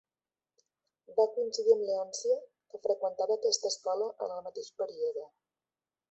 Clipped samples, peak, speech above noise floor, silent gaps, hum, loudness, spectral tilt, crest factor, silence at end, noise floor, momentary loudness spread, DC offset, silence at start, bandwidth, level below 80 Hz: under 0.1%; -14 dBFS; over 59 dB; none; none; -32 LUFS; -1.5 dB/octave; 20 dB; 0.85 s; under -90 dBFS; 11 LU; under 0.1%; 1.1 s; 8.2 kHz; -84 dBFS